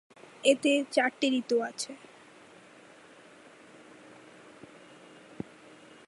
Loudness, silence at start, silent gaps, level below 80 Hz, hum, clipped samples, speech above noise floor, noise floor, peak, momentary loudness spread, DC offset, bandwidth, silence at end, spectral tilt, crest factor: -28 LUFS; 0.45 s; none; -78 dBFS; none; under 0.1%; 27 dB; -54 dBFS; -10 dBFS; 26 LU; under 0.1%; 11.5 kHz; 4.15 s; -3 dB/octave; 22 dB